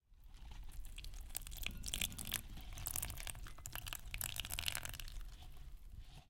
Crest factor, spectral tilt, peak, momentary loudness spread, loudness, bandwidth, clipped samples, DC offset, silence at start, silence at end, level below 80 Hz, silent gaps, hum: 30 dB; -1.5 dB/octave; -18 dBFS; 17 LU; -45 LUFS; 17 kHz; under 0.1%; under 0.1%; 0.1 s; 0 s; -52 dBFS; none; none